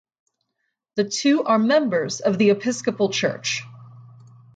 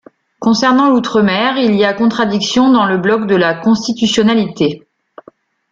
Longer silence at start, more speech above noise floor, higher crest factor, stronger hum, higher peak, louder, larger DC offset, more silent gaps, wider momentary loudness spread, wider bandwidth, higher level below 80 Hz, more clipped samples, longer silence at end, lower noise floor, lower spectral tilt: first, 0.95 s vs 0.4 s; first, 56 dB vs 33 dB; about the same, 16 dB vs 12 dB; neither; second, -6 dBFS vs -2 dBFS; second, -21 LUFS vs -12 LUFS; neither; neither; first, 8 LU vs 5 LU; first, 9.2 kHz vs 7.6 kHz; second, -70 dBFS vs -52 dBFS; neither; second, 0.5 s vs 0.95 s; first, -77 dBFS vs -45 dBFS; about the same, -4.5 dB/octave vs -5 dB/octave